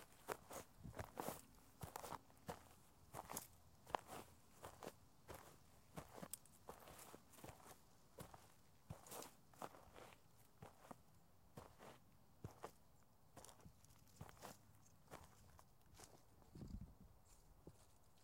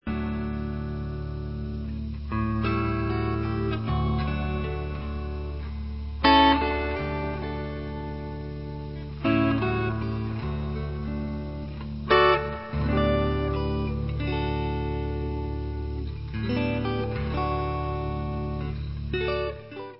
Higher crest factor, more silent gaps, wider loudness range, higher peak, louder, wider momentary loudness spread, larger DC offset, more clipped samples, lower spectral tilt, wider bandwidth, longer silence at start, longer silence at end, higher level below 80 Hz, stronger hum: first, 36 dB vs 20 dB; neither; first, 8 LU vs 4 LU; second, -24 dBFS vs -8 dBFS; second, -59 LUFS vs -28 LUFS; first, 15 LU vs 11 LU; second, under 0.1% vs 0.3%; neither; second, -4 dB/octave vs -11 dB/octave; first, 16.5 kHz vs 5.8 kHz; about the same, 0 s vs 0 s; about the same, 0 s vs 0 s; second, -74 dBFS vs -34 dBFS; neither